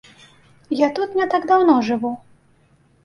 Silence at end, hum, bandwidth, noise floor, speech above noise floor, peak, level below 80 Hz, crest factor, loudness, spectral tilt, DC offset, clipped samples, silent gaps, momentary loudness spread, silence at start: 0.85 s; none; 11 kHz; -57 dBFS; 39 dB; -4 dBFS; -62 dBFS; 18 dB; -19 LUFS; -6 dB/octave; under 0.1%; under 0.1%; none; 13 LU; 0.7 s